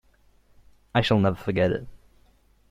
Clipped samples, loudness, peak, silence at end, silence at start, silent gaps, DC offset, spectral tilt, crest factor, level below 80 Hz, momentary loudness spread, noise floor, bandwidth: under 0.1%; -24 LUFS; -6 dBFS; 0.75 s; 0.95 s; none; under 0.1%; -7 dB/octave; 20 dB; -50 dBFS; 6 LU; -60 dBFS; 13.5 kHz